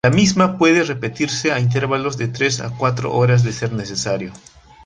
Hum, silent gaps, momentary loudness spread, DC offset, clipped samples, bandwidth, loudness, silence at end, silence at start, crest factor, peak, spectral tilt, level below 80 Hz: none; none; 9 LU; under 0.1%; under 0.1%; 9.6 kHz; -18 LUFS; 0.45 s; 0.05 s; 16 dB; -2 dBFS; -5 dB/octave; -48 dBFS